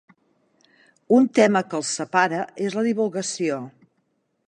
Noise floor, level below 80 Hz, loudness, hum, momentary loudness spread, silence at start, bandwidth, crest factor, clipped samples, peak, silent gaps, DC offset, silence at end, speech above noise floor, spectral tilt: -71 dBFS; -76 dBFS; -22 LUFS; none; 9 LU; 1.1 s; 10.5 kHz; 20 dB; under 0.1%; -4 dBFS; none; under 0.1%; 0.8 s; 50 dB; -4.5 dB/octave